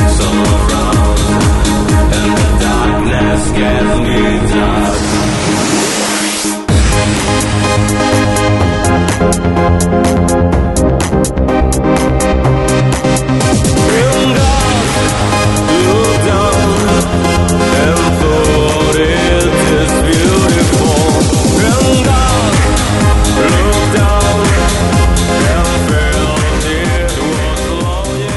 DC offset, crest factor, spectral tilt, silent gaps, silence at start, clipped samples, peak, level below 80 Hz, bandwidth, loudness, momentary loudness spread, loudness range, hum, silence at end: under 0.1%; 10 dB; -5 dB/octave; none; 0 s; under 0.1%; 0 dBFS; -18 dBFS; 12 kHz; -11 LUFS; 3 LU; 2 LU; none; 0 s